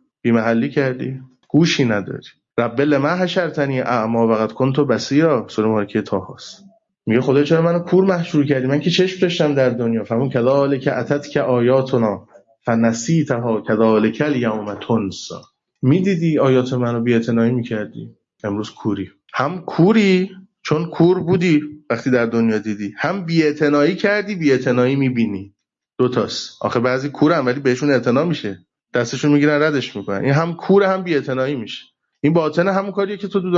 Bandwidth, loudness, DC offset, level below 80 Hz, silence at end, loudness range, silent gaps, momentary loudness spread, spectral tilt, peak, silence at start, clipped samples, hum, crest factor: 7.8 kHz; -18 LUFS; under 0.1%; -60 dBFS; 0 s; 2 LU; none; 10 LU; -6.5 dB/octave; -4 dBFS; 0.25 s; under 0.1%; none; 14 dB